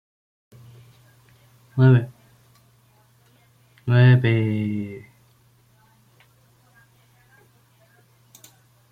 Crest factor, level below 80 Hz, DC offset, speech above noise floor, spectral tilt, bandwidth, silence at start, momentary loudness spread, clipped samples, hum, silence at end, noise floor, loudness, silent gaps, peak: 20 dB; -62 dBFS; under 0.1%; 41 dB; -8.5 dB/octave; 4.9 kHz; 1.75 s; 20 LU; under 0.1%; none; 3.95 s; -58 dBFS; -19 LUFS; none; -4 dBFS